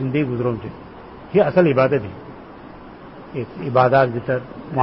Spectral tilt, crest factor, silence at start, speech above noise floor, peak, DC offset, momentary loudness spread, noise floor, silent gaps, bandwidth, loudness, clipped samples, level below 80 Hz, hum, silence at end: -12 dB/octave; 18 dB; 0 s; 20 dB; -2 dBFS; 0.1%; 24 LU; -39 dBFS; none; 5.8 kHz; -19 LUFS; under 0.1%; -50 dBFS; none; 0 s